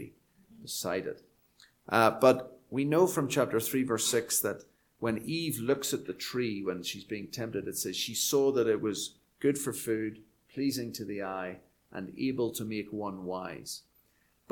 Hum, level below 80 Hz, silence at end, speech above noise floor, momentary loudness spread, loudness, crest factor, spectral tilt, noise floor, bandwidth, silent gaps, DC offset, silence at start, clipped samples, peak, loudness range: none; -70 dBFS; 0.7 s; 39 dB; 15 LU; -31 LUFS; 24 dB; -4 dB/octave; -70 dBFS; 19 kHz; none; under 0.1%; 0 s; under 0.1%; -8 dBFS; 8 LU